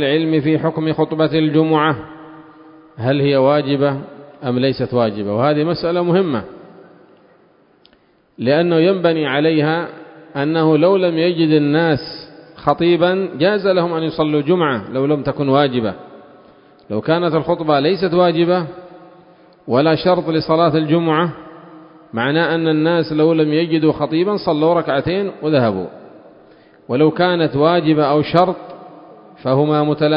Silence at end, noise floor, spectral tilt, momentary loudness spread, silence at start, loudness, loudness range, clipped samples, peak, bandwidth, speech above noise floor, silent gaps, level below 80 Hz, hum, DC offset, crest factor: 0 s; -55 dBFS; -10 dB/octave; 10 LU; 0 s; -16 LUFS; 3 LU; under 0.1%; 0 dBFS; 5.4 kHz; 39 dB; none; -52 dBFS; none; under 0.1%; 16 dB